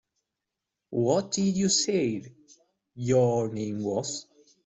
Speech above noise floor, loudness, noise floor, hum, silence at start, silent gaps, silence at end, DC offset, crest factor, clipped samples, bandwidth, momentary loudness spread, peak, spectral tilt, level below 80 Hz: 60 dB; -27 LUFS; -86 dBFS; none; 0.9 s; none; 0.45 s; under 0.1%; 16 dB; under 0.1%; 8.2 kHz; 12 LU; -12 dBFS; -4.5 dB/octave; -64 dBFS